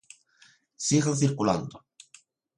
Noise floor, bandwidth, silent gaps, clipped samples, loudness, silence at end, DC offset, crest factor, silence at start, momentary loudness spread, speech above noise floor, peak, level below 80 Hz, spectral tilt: -61 dBFS; 11.5 kHz; none; under 0.1%; -26 LUFS; 0.8 s; under 0.1%; 20 dB; 0.8 s; 8 LU; 36 dB; -10 dBFS; -62 dBFS; -5 dB/octave